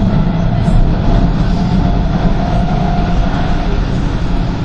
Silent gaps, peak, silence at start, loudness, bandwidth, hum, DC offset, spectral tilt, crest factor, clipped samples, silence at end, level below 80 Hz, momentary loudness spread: none; -2 dBFS; 0 s; -15 LUFS; 7.4 kHz; none; under 0.1%; -8 dB/octave; 10 dB; under 0.1%; 0 s; -14 dBFS; 3 LU